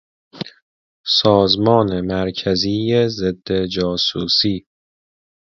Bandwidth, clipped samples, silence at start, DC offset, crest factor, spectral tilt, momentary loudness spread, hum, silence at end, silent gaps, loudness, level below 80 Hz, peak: 7.6 kHz; under 0.1%; 0.35 s; under 0.1%; 18 dB; -6 dB/octave; 16 LU; none; 0.85 s; 0.62-1.04 s; -17 LUFS; -44 dBFS; 0 dBFS